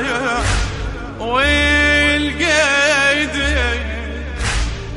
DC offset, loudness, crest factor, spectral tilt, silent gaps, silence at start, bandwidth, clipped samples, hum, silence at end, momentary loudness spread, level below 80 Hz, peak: under 0.1%; -15 LUFS; 14 dB; -3.5 dB/octave; none; 0 s; 11.5 kHz; under 0.1%; none; 0 s; 13 LU; -24 dBFS; -2 dBFS